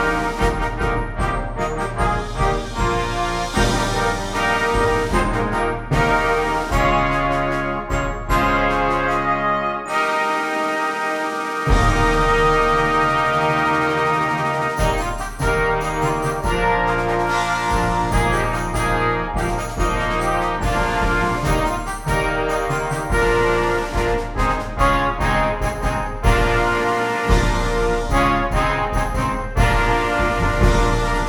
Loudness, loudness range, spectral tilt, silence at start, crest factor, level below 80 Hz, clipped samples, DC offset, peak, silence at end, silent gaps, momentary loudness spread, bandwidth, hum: -19 LUFS; 3 LU; -5 dB/octave; 0 s; 16 dB; -26 dBFS; under 0.1%; under 0.1%; -2 dBFS; 0 s; none; 5 LU; 18 kHz; none